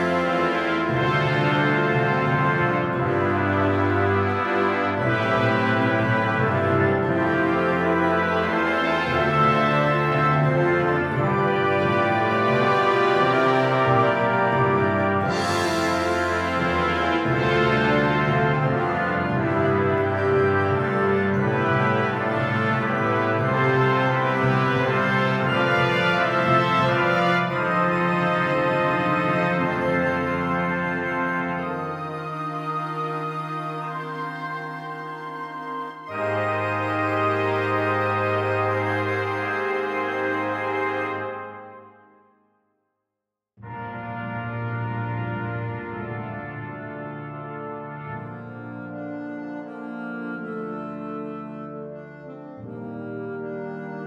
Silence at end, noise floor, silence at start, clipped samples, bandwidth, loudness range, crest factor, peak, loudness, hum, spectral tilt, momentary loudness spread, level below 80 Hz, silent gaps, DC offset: 0 s; -85 dBFS; 0 s; under 0.1%; 12.5 kHz; 13 LU; 16 dB; -6 dBFS; -22 LUFS; none; -7 dB/octave; 14 LU; -52 dBFS; none; under 0.1%